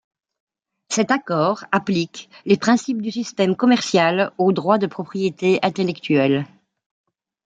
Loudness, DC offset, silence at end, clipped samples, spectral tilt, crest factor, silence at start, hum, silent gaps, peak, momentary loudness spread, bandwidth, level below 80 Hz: -20 LUFS; under 0.1%; 1 s; under 0.1%; -5 dB/octave; 18 dB; 0.9 s; none; none; -2 dBFS; 8 LU; 9.4 kHz; -66 dBFS